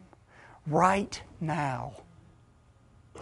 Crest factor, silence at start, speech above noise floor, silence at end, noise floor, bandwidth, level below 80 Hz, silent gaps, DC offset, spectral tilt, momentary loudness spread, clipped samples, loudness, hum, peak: 24 dB; 0.65 s; 31 dB; 0 s; -60 dBFS; 11.5 kHz; -58 dBFS; none; under 0.1%; -6 dB/octave; 16 LU; under 0.1%; -29 LUFS; none; -10 dBFS